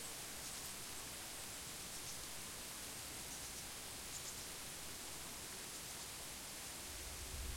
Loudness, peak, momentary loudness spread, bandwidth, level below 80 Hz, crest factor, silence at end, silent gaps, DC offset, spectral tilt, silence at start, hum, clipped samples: -47 LUFS; -32 dBFS; 1 LU; 16.5 kHz; -60 dBFS; 18 dB; 0 s; none; under 0.1%; -1.5 dB/octave; 0 s; none; under 0.1%